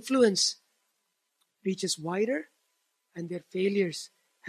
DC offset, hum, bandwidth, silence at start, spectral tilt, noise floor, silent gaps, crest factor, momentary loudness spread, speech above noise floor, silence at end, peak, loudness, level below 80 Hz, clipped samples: under 0.1%; none; 14 kHz; 0.05 s; -3.5 dB/octave; -79 dBFS; none; 20 dB; 19 LU; 50 dB; 0 s; -10 dBFS; -29 LUFS; -80 dBFS; under 0.1%